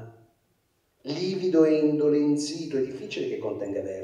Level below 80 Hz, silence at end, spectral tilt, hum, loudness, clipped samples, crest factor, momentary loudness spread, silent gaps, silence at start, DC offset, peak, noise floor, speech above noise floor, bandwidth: -72 dBFS; 0 s; -6 dB/octave; none; -26 LUFS; under 0.1%; 18 dB; 11 LU; none; 0 s; under 0.1%; -8 dBFS; -70 dBFS; 45 dB; 11 kHz